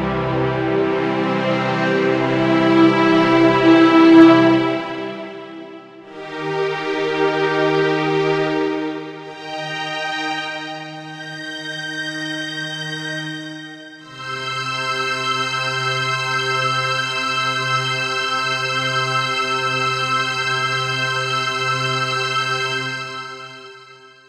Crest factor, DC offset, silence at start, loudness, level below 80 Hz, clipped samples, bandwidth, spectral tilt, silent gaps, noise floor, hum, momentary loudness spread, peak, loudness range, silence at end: 18 dB; under 0.1%; 0 s; -18 LUFS; -54 dBFS; under 0.1%; 11.5 kHz; -5 dB/octave; none; -44 dBFS; none; 17 LU; 0 dBFS; 12 LU; 0.2 s